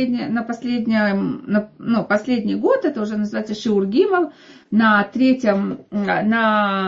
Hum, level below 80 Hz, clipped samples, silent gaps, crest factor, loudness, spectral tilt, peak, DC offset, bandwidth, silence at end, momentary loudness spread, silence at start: none; -60 dBFS; under 0.1%; none; 16 dB; -19 LUFS; -7 dB/octave; -4 dBFS; under 0.1%; 7.4 kHz; 0 s; 7 LU; 0 s